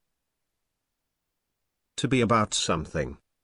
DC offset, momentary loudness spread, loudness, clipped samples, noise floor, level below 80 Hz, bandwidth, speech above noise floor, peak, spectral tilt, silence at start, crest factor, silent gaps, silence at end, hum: under 0.1%; 12 LU; -26 LUFS; under 0.1%; -82 dBFS; -50 dBFS; 11 kHz; 57 dB; -10 dBFS; -4.5 dB/octave; 1.95 s; 20 dB; none; 0.3 s; none